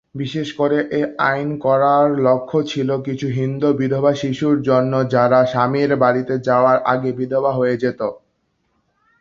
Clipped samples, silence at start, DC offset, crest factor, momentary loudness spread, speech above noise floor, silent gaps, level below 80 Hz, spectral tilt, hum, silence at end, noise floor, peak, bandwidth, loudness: under 0.1%; 0.15 s; under 0.1%; 16 dB; 7 LU; 50 dB; none; -58 dBFS; -7.5 dB/octave; none; 1.05 s; -67 dBFS; -2 dBFS; 7.4 kHz; -17 LUFS